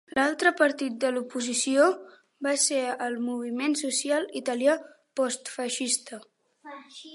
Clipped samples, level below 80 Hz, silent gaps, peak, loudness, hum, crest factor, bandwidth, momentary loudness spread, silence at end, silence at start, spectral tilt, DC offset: under 0.1%; -76 dBFS; none; -6 dBFS; -26 LUFS; none; 20 dB; 11.5 kHz; 15 LU; 0 s; 0.15 s; -1 dB/octave; under 0.1%